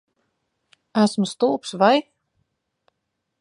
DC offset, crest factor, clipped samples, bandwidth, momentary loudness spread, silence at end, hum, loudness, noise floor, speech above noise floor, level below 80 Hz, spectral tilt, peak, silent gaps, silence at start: under 0.1%; 22 dB; under 0.1%; 11 kHz; 5 LU; 1.4 s; none; -20 LUFS; -78 dBFS; 59 dB; -74 dBFS; -5 dB/octave; -2 dBFS; none; 0.95 s